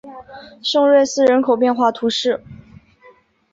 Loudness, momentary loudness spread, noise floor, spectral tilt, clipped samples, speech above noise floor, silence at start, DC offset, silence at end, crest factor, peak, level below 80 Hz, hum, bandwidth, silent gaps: -16 LUFS; 13 LU; -50 dBFS; -3.5 dB/octave; under 0.1%; 34 dB; 0.05 s; under 0.1%; 0.95 s; 14 dB; -4 dBFS; -58 dBFS; none; 7.8 kHz; none